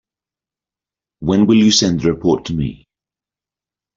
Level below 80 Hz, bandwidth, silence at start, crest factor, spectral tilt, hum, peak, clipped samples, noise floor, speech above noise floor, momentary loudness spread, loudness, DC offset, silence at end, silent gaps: -44 dBFS; 7.6 kHz; 1.2 s; 16 dB; -5 dB/octave; none; -2 dBFS; under 0.1%; -89 dBFS; 75 dB; 13 LU; -15 LUFS; under 0.1%; 1.2 s; none